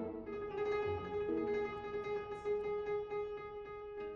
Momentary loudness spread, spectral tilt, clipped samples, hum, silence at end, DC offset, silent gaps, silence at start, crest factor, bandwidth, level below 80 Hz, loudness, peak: 9 LU; -7.5 dB/octave; under 0.1%; none; 0 s; under 0.1%; none; 0 s; 12 dB; 6.6 kHz; -62 dBFS; -40 LUFS; -28 dBFS